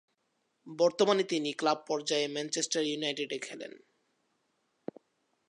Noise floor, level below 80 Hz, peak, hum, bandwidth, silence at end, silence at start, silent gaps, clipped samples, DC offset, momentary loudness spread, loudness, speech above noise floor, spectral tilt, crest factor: -78 dBFS; -84 dBFS; -12 dBFS; none; 11.5 kHz; 1.7 s; 0.65 s; none; under 0.1%; under 0.1%; 20 LU; -31 LUFS; 47 dB; -3 dB/octave; 22 dB